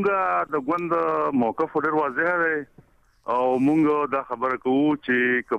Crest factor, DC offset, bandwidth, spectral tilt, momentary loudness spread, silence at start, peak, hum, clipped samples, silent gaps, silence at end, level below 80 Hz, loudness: 12 dB; under 0.1%; 8.6 kHz; -7.5 dB/octave; 5 LU; 0 s; -12 dBFS; none; under 0.1%; none; 0 s; -62 dBFS; -23 LUFS